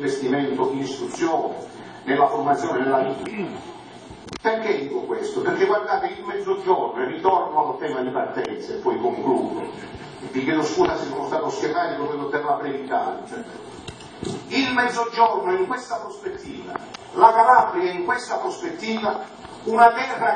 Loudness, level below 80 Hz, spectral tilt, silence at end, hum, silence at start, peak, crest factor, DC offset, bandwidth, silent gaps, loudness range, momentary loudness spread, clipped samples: -22 LUFS; -60 dBFS; -5 dB/octave; 0 s; none; 0 s; 0 dBFS; 22 dB; under 0.1%; 9.8 kHz; none; 5 LU; 17 LU; under 0.1%